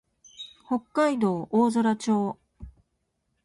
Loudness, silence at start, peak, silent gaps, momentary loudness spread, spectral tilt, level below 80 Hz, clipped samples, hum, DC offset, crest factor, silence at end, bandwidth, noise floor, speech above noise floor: -25 LUFS; 0.4 s; -10 dBFS; none; 19 LU; -6 dB/octave; -58 dBFS; under 0.1%; none; under 0.1%; 16 dB; 0.75 s; 11.5 kHz; -76 dBFS; 52 dB